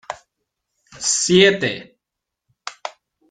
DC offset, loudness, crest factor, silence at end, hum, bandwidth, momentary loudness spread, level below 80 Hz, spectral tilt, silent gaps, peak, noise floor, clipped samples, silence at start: under 0.1%; -16 LUFS; 20 dB; 0.4 s; none; 9.6 kHz; 22 LU; -60 dBFS; -3 dB/octave; none; -2 dBFS; -83 dBFS; under 0.1%; 0.1 s